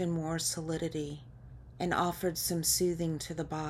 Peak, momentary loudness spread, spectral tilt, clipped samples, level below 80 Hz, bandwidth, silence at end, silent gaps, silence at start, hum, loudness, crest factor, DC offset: -16 dBFS; 18 LU; -4 dB/octave; under 0.1%; -54 dBFS; 16 kHz; 0 s; none; 0 s; none; -32 LUFS; 18 dB; under 0.1%